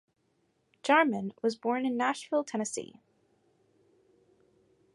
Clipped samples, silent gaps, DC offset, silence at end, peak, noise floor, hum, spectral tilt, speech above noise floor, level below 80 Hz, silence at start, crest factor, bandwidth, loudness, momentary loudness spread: under 0.1%; none; under 0.1%; 2.1 s; -10 dBFS; -74 dBFS; none; -4 dB/octave; 44 dB; -82 dBFS; 0.85 s; 24 dB; 11.5 kHz; -30 LUFS; 13 LU